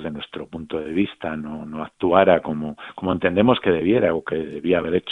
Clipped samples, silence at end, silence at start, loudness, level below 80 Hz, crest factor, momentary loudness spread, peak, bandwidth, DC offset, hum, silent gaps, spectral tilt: under 0.1%; 0 s; 0 s; -21 LUFS; -52 dBFS; 20 dB; 14 LU; 0 dBFS; 4.1 kHz; under 0.1%; none; none; -8.5 dB/octave